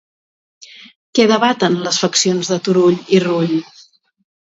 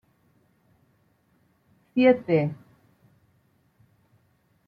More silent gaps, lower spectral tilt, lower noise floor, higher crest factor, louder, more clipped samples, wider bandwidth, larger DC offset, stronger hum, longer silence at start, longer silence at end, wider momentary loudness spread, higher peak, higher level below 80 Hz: first, 0.96-1.13 s vs none; second, -4 dB/octave vs -9.5 dB/octave; second, -48 dBFS vs -67 dBFS; second, 16 dB vs 22 dB; first, -15 LUFS vs -23 LUFS; neither; first, 8 kHz vs 5.2 kHz; neither; neither; second, 0.6 s vs 1.95 s; second, 0.85 s vs 2.15 s; second, 6 LU vs 13 LU; first, 0 dBFS vs -8 dBFS; first, -64 dBFS vs -72 dBFS